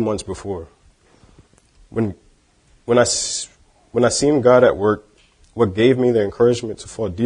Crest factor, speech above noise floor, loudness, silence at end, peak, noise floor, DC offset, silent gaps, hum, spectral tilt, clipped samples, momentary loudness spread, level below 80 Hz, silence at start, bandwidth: 20 dB; 38 dB; -18 LUFS; 0 s; 0 dBFS; -56 dBFS; under 0.1%; none; none; -4.5 dB/octave; under 0.1%; 16 LU; -48 dBFS; 0 s; 10.5 kHz